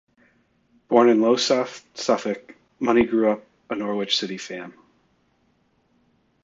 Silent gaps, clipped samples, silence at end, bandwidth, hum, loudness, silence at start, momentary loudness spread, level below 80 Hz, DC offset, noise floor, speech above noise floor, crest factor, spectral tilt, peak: none; under 0.1%; 1.75 s; 7.8 kHz; none; -22 LUFS; 0.9 s; 16 LU; -60 dBFS; under 0.1%; -65 dBFS; 44 dB; 22 dB; -4 dB/octave; -2 dBFS